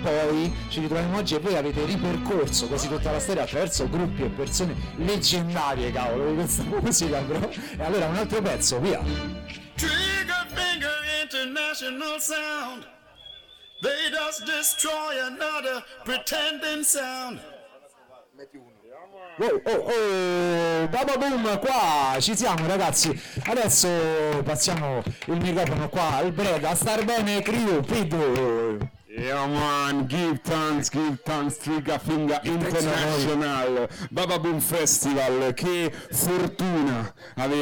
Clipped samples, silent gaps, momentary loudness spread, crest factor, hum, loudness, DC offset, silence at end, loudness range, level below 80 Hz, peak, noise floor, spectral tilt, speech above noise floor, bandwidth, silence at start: under 0.1%; none; 8 LU; 16 dB; none; -25 LUFS; under 0.1%; 0 s; 5 LU; -44 dBFS; -10 dBFS; -53 dBFS; -3.5 dB/octave; 28 dB; 19 kHz; 0 s